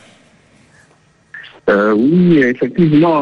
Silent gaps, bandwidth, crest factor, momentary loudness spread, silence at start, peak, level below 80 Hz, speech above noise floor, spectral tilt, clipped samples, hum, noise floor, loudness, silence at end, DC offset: none; 6.6 kHz; 14 dB; 15 LU; 1.35 s; 0 dBFS; -52 dBFS; 41 dB; -9 dB/octave; under 0.1%; none; -52 dBFS; -12 LUFS; 0 s; under 0.1%